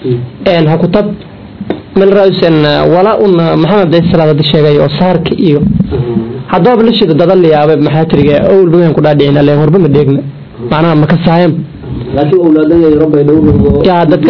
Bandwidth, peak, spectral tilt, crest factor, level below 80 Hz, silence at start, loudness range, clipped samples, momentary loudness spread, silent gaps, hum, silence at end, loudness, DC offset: 5.4 kHz; 0 dBFS; -9.5 dB/octave; 8 dB; -30 dBFS; 0 s; 2 LU; 5%; 8 LU; none; none; 0 s; -7 LUFS; 1%